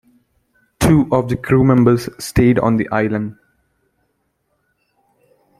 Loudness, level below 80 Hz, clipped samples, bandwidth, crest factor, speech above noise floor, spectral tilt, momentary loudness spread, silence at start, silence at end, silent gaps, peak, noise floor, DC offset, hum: -15 LUFS; -38 dBFS; under 0.1%; 15.5 kHz; 16 dB; 53 dB; -7 dB/octave; 8 LU; 0.8 s; 2.25 s; none; -2 dBFS; -67 dBFS; under 0.1%; none